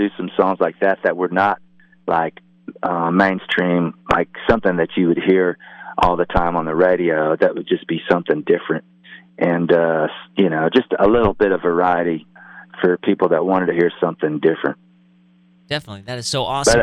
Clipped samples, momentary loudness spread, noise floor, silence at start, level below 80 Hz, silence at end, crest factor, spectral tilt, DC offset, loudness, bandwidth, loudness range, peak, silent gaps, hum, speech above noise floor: under 0.1%; 10 LU; -53 dBFS; 0 s; -42 dBFS; 0 s; 16 dB; -5.5 dB/octave; under 0.1%; -18 LUFS; 13 kHz; 2 LU; -2 dBFS; none; none; 35 dB